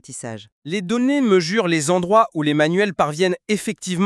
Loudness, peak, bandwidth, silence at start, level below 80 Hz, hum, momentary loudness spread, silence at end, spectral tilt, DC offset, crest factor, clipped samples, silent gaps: -19 LUFS; -2 dBFS; 13 kHz; 0.1 s; -62 dBFS; none; 13 LU; 0 s; -5 dB/octave; under 0.1%; 16 dB; under 0.1%; 0.52-0.62 s